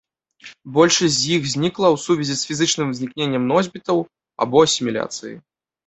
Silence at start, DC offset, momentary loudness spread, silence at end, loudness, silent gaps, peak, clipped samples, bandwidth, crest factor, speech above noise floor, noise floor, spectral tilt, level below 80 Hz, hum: 0.45 s; under 0.1%; 10 LU; 0.45 s; -19 LUFS; none; 0 dBFS; under 0.1%; 8.4 kHz; 20 dB; 26 dB; -45 dBFS; -4 dB/octave; -58 dBFS; none